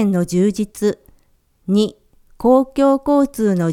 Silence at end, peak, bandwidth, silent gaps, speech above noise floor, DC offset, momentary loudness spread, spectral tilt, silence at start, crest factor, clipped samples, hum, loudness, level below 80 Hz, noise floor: 0 s; -2 dBFS; 15.5 kHz; none; 42 dB; under 0.1%; 7 LU; -7 dB/octave; 0 s; 16 dB; under 0.1%; none; -17 LUFS; -46 dBFS; -57 dBFS